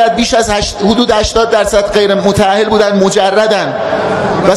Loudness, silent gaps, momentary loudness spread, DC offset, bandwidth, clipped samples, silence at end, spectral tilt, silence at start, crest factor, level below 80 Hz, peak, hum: -10 LUFS; none; 4 LU; under 0.1%; 14.5 kHz; under 0.1%; 0 s; -4 dB/octave; 0 s; 10 dB; -30 dBFS; 0 dBFS; none